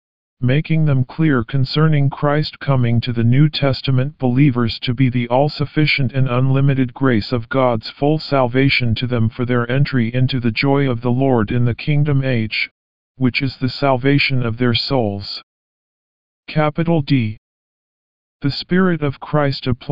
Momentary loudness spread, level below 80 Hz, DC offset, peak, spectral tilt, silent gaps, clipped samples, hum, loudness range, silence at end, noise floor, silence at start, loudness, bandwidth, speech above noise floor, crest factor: 5 LU; -44 dBFS; 3%; -2 dBFS; -9 dB/octave; 12.71-13.15 s, 15.43-16.43 s, 17.38-18.40 s; under 0.1%; none; 4 LU; 0 s; under -90 dBFS; 0.35 s; -17 LUFS; 5.4 kHz; over 74 dB; 16 dB